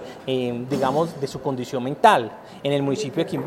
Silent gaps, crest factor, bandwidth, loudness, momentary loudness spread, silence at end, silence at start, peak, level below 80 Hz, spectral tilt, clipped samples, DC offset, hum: none; 22 dB; 16 kHz; -23 LUFS; 11 LU; 0 s; 0 s; -2 dBFS; -60 dBFS; -5.5 dB/octave; under 0.1%; under 0.1%; none